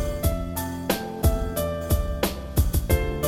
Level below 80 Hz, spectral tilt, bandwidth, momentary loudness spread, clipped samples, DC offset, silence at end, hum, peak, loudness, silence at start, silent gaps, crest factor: -28 dBFS; -5.5 dB/octave; 17 kHz; 4 LU; under 0.1%; under 0.1%; 0 s; none; -8 dBFS; -26 LUFS; 0 s; none; 16 dB